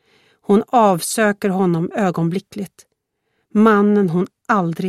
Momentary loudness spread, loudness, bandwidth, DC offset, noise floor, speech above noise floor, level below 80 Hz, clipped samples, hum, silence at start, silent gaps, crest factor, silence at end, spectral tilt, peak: 14 LU; -17 LUFS; 15 kHz; under 0.1%; -71 dBFS; 55 dB; -62 dBFS; under 0.1%; none; 0.5 s; none; 16 dB; 0 s; -6 dB/octave; 0 dBFS